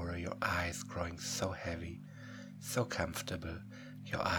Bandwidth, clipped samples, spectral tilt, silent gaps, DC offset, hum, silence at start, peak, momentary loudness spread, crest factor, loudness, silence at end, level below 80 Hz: over 20 kHz; under 0.1%; -4 dB/octave; none; under 0.1%; 50 Hz at -55 dBFS; 0 s; -18 dBFS; 14 LU; 22 dB; -39 LUFS; 0 s; -56 dBFS